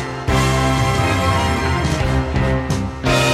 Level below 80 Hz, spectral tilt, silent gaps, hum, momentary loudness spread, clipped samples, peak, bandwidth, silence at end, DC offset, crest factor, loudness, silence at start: -26 dBFS; -5 dB/octave; none; none; 3 LU; under 0.1%; -4 dBFS; 15 kHz; 0 s; under 0.1%; 12 dB; -18 LUFS; 0 s